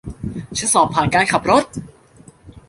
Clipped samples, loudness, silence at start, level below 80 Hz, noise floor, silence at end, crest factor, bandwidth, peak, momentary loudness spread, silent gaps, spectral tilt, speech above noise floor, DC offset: under 0.1%; -16 LUFS; 0.05 s; -42 dBFS; -47 dBFS; 0.1 s; 18 dB; 11.5 kHz; -2 dBFS; 15 LU; none; -3.5 dB/octave; 30 dB; under 0.1%